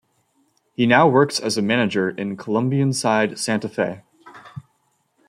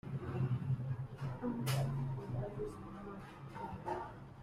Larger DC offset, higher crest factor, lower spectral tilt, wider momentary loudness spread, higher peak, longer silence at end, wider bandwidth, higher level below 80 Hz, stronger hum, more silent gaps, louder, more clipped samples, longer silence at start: neither; about the same, 20 dB vs 16 dB; second, -5 dB/octave vs -7 dB/octave; first, 21 LU vs 12 LU; first, -2 dBFS vs -24 dBFS; first, 0.65 s vs 0 s; about the same, 15.5 kHz vs 15.5 kHz; second, -64 dBFS vs -58 dBFS; neither; neither; first, -20 LUFS vs -41 LUFS; neither; first, 0.8 s vs 0.05 s